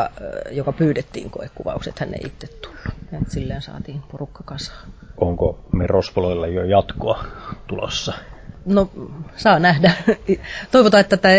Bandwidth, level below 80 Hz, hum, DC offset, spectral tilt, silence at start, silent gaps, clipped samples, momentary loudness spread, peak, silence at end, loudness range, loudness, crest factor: 8 kHz; -36 dBFS; none; under 0.1%; -6 dB/octave; 0 s; none; under 0.1%; 19 LU; -2 dBFS; 0 s; 12 LU; -19 LUFS; 18 dB